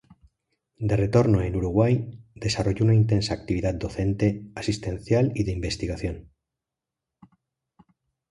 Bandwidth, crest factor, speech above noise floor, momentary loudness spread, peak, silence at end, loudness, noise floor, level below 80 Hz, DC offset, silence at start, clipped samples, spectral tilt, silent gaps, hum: 11 kHz; 20 dB; 64 dB; 11 LU; -6 dBFS; 2.1 s; -25 LUFS; -87 dBFS; -42 dBFS; under 0.1%; 0.8 s; under 0.1%; -7 dB/octave; none; none